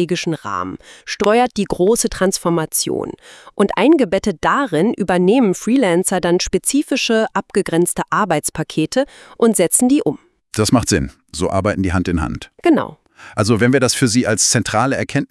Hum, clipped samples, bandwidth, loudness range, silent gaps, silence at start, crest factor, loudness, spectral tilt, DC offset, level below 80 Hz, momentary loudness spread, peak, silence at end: none; under 0.1%; 12 kHz; 2 LU; none; 0 s; 16 dB; -16 LUFS; -4.5 dB/octave; under 0.1%; -42 dBFS; 11 LU; 0 dBFS; 0.05 s